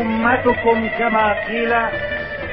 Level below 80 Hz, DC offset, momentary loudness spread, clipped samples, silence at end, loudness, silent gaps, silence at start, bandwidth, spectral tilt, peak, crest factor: -40 dBFS; under 0.1%; 7 LU; under 0.1%; 0 s; -18 LUFS; none; 0 s; 5.6 kHz; -9 dB/octave; -2 dBFS; 16 dB